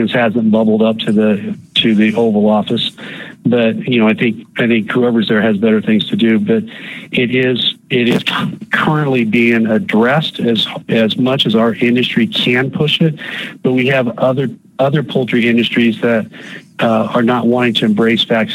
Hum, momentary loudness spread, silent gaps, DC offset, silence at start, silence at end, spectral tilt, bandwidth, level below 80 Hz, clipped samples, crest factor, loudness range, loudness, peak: none; 6 LU; none; under 0.1%; 0 s; 0 s; -6.5 dB/octave; 12 kHz; -58 dBFS; under 0.1%; 12 dB; 2 LU; -13 LUFS; -2 dBFS